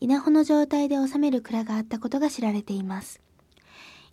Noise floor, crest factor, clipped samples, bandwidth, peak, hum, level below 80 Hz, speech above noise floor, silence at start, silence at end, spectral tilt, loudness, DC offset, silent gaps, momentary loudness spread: -57 dBFS; 14 dB; under 0.1%; 13.5 kHz; -10 dBFS; none; -66 dBFS; 33 dB; 0 s; 0.25 s; -6 dB/octave; -25 LUFS; under 0.1%; none; 11 LU